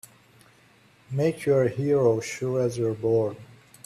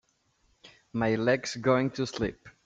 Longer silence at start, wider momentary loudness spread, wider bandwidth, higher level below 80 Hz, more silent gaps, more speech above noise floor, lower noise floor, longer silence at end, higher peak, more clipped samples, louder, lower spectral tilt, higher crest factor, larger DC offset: first, 1.1 s vs 0.65 s; about the same, 8 LU vs 8 LU; first, 14.5 kHz vs 9.2 kHz; second, -62 dBFS vs -56 dBFS; neither; second, 34 dB vs 43 dB; second, -58 dBFS vs -70 dBFS; first, 0.4 s vs 0.15 s; about the same, -10 dBFS vs -10 dBFS; neither; first, -25 LUFS vs -29 LUFS; first, -7 dB/octave vs -5.5 dB/octave; about the same, 16 dB vs 20 dB; neither